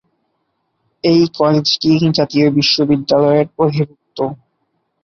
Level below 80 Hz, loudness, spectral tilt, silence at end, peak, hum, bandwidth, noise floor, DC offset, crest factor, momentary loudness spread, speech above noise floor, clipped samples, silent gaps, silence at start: -54 dBFS; -14 LUFS; -6 dB/octave; 0.7 s; -2 dBFS; none; 7 kHz; -68 dBFS; under 0.1%; 14 dB; 10 LU; 54 dB; under 0.1%; none; 1.05 s